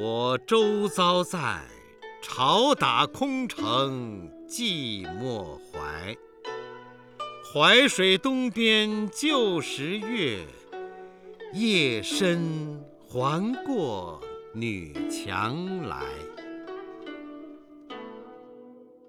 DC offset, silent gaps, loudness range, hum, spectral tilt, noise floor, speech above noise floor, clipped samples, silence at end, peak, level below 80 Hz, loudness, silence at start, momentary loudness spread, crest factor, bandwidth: under 0.1%; none; 11 LU; none; -4 dB/octave; -50 dBFS; 24 dB; under 0.1%; 0.25 s; -6 dBFS; -60 dBFS; -25 LUFS; 0 s; 20 LU; 22 dB; 17 kHz